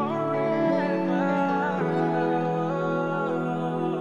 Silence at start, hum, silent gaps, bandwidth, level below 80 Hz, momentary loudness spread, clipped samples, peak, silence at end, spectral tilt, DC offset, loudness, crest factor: 0 s; none; none; 9.2 kHz; -70 dBFS; 3 LU; under 0.1%; -12 dBFS; 0 s; -8.5 dB/octave; under 0.1%; -25 LUFS; 12 dB